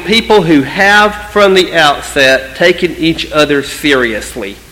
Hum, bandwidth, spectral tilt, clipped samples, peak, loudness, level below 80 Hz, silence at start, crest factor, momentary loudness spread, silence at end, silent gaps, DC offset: none; 17 kHz; -4 dB/octave; 0.9%; 0 dBFS; -9 LUFS; -36 dBFS; 0 s; 10 dB; 6 LU; 0.15 s; none; under 0.1%